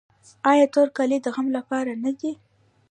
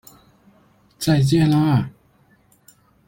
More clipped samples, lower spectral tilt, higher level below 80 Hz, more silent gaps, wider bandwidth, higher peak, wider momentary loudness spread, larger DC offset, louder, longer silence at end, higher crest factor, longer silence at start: neither; second, -4.5 dB/octave vs -6.5 dB/octave; second, -76 dBFS vs -50 dBFS; neither; second, 9.8 kHz vs 16.5 kHz; about the same, -6 dBFS vs -6 dBFS; first, 12 LU vs 9 LU; neither; second, -22 LUFS vs -18 LUFS; second, 0.55 s vs 1.2 s; about the same, 18 dB vs 16 dB; second, 0.45 s vs 1 s